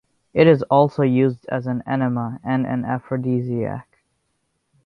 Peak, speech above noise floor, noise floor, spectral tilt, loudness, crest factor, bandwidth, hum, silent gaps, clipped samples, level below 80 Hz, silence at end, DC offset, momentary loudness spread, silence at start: -2 dBFS; 52 dB; -71 dBFS; -9.5 dB/octave; -20 LUFS; 20 dB; 5.8 kHz; none; none; under 0.1%; -58 dBFS; 1.05 s; under 0.1%; 11 LU; 0.35 s